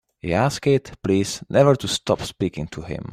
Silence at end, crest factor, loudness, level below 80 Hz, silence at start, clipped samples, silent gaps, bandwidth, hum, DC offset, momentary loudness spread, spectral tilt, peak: 0 s; 18 dB; -21 LUFS; -48 dBFS; 0.25 s; under 0.1%; none; 15 kHz; none; under 0.1%; 11 LU; -5.5 dB/octave; -4 dBFS